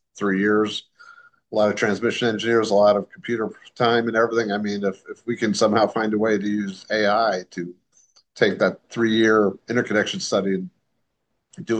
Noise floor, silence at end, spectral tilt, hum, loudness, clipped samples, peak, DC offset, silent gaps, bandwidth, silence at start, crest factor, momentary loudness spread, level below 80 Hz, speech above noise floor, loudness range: -75 dBFS; 0 s; -5 dB/octave; none; -21 LUFS; under 0.1%; -4 dBFS; under 0.1%; none; 9.4 kHz; 0.15 s; 18 dB; 11 LU; -70 dBFS; 54 dB; 1 LU